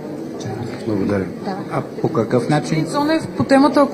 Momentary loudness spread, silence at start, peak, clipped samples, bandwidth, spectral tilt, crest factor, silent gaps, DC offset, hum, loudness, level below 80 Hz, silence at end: 13 LU; 0 s; 0 dBFS; under 0.1%; 15.5 kHz; -6.5 dB/octave; 18 dB; none; under 0.1%; none; -19 LUFS; -56 dBFS; 0 s